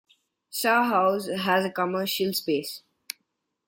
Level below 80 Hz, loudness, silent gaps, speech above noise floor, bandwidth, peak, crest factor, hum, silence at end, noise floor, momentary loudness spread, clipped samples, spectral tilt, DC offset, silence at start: -74 dBFS; -25 LUFS; none; 53 dB; 17 kHz; -8 dBFS; 18 dB; none; 0.9 s; -78 dBFS; 18 LU; under 0.1%; -4 dB/octave; under 0.1%; 0.55 s